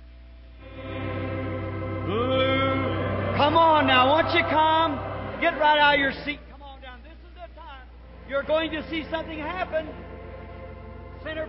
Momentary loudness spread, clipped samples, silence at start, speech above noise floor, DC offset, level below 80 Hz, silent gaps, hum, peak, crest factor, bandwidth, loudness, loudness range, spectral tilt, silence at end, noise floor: 24 LU; under 0.1%; 0 s; 23 dB; under 0.1%; -44 dBFS; none; none; -8 dBFS; 18 dB; 5.8 kHz; -23 LUFS; 10 LU; -9.5 dB/octave; 0 s; -45 dBFS